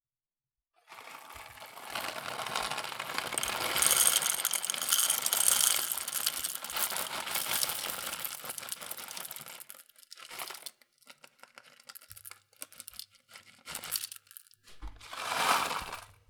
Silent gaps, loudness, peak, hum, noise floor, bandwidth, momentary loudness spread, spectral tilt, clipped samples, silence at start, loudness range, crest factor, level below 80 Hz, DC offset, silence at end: none; -30 LUFS; -2 dBFS; none; under -90 dBFS; over 20 kHz; 24 LU; 1 dB/octave; under 0.1%; 0.9 s; 20 LU; 32 dB; -62 dBFS; under 0.1%; 0.15 s